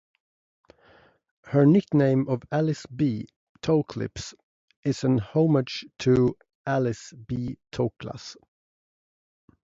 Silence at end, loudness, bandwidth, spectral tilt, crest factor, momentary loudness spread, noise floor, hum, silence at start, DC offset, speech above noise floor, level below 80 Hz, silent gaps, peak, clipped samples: 1.3 s; -25 LUFS; 7.8 kHz; -7.5 dB/octave; 18 dB; 17 LU; -58 dBFS; none; 1.45 s; under 0.1%; 34 dB; -56 dBFS; 3.36-3.55 s, 4.43-4.68 s, 4.77-4.83 s, 6.55-6.64 s; -8 dBFS; under 0.1%